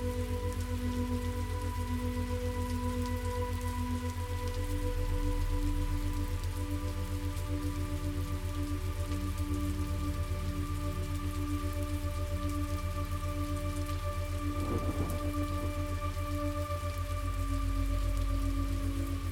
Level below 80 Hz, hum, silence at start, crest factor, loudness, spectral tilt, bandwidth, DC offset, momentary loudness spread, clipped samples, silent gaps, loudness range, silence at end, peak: -36 dBFS; none; 0 s; 12 dB; -35 LUFS; -6.5 dB/octave; 16.5 kHz; under 0.1%; 2 LU; under 0.1%; none; 1 LU; 0 s; -20 dBFS